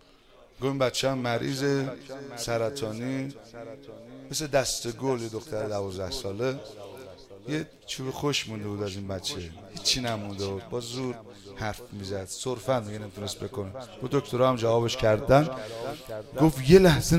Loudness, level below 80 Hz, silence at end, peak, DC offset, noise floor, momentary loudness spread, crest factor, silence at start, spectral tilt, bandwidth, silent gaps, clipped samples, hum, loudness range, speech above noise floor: -28 LUFS; -48 dBFS; 0 s; -2 dBFS; under 0.1%; -55 dBFS; 17 LU; 26 dB; 0.6 s; -5 dB/octave; 16 kHz; none; under 0.1%; none; 7 LU; 28 dB